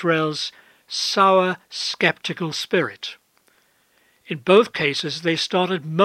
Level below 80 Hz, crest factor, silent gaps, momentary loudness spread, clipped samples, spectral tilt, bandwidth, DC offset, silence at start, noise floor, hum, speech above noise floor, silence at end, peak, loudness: -72 dBFS; 20 dB; none; 13 LU; under 0.1%; -4 dB/octave; 15 kHz; under 0.1%; 0 s; -61 dBFS; none; 41 dB; 0 s; -2 dBFS; -20 LUFS